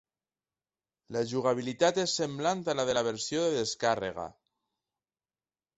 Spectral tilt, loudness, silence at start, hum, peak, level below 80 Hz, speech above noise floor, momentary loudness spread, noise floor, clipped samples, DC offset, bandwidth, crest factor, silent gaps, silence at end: -3.5 dB/octave; -30 LUFS; 1.1 s; none; -10 dBFS; -68 dBFS; over 60 dB; 9 LU; under -90 dBFS; under 0.1%; under 0.1%; 8.2 kHz; 22 dB; none; 1.45 s